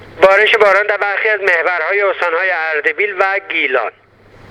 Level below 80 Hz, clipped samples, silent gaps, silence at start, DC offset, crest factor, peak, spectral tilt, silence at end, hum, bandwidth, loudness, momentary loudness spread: -54 dBFS; under 0.1%; none; 0 s; under 0.1%; 14 dB; 0 dBFS; -3 dB/octave; 0.6 s; none; 12 kHz; -13 LUFS; 6 LU